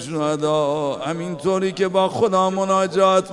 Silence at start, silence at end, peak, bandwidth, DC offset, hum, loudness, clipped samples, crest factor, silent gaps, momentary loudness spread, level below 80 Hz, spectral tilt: 0 s; 0 s; -4 dBFS; 11.5 kHz; under 0.1%; none; -20 LUFS; under 0.1%; 16 dB; none; 7 LU; -60 dBFS; -5.5 dB/octave